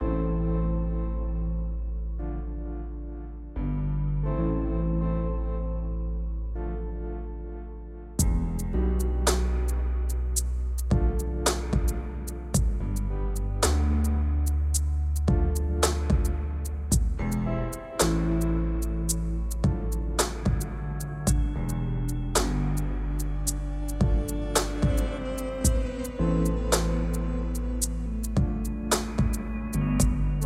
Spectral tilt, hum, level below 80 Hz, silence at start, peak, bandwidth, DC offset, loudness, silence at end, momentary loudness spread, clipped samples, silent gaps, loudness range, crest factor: -5.5 dB/octave; none; -28 dBFS; 0 s; -6 dBFS; 15.5 kHz; under 0.1%; -28 LUFS; 0 s; 8 LU; under 0.1%; none; 5 LU; 20 dB